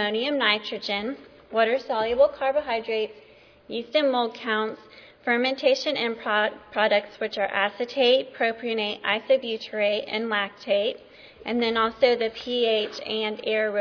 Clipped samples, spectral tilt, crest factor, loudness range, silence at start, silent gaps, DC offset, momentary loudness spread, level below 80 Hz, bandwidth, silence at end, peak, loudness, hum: under 0.1%; -4 dB/octave; 20 dB; 2 LU; 0 s; none; under 0.1%; 9 LU; -64 dBFS; 5.4 kHz; 0 s; -6 dBFS; -25 LUFS; none